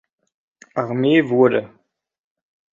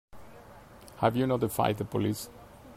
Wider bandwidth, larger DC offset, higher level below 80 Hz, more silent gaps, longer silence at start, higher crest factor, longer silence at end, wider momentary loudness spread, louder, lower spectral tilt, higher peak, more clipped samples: second, 7.2 kHz vs 16 kHz; neither; second, -64 dBFS vs -58 dBFS; neither; first, 0.75 s vs 0.15 s; about the same, 18 dB vs 22 dB; first, 1.05 s vs 0 s; second, 11 LU vs 23 LU; first, -18 LUFS vs -29 LUFS; first, -8 dB/octave vs -6 dB/octave; first, -2 dBFS vs -10 dBFS; neither